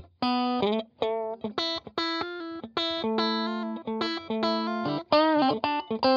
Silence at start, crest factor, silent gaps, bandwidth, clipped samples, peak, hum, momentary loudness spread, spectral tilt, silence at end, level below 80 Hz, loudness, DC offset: 0 s; 20 dB; none; 7.4 kHz; under 0.1%; -8 dBFS; none; 9 LU; -5.5 dB/octave; 0 s; -64 dBFS; -28 LUFS; under 0.1%